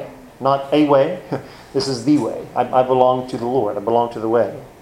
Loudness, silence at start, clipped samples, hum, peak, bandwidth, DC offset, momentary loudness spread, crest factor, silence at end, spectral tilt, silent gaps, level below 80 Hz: -18 LUFS; 0 s; under 0.1%; none; 0 dBFS; 13.5 kHz; under 0.1%; 10 LU; 18 dB; 0.1 s; -6.5 dB/octave; none; -54 dBFS